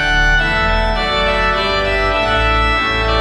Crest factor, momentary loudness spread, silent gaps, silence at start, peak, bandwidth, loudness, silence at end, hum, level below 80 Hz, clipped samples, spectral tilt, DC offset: 12 dB; 2 LU; none; 0 s; -2 dBFS; 11 kHz; -14 LUFS; 0 s; none; -20 dBFS; under 0.1%; -4.5 dB/octave; under 0.1%